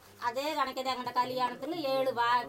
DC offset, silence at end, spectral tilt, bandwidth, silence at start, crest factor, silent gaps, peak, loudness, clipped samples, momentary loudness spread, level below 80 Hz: under 0.1%; 0 s; -3.5 dB/octave; 16 kHz; 0.05 s; 14 dB; none; -18 dBFS; -32 LUFS; under 0.1%; 5 LU; -72 dBFS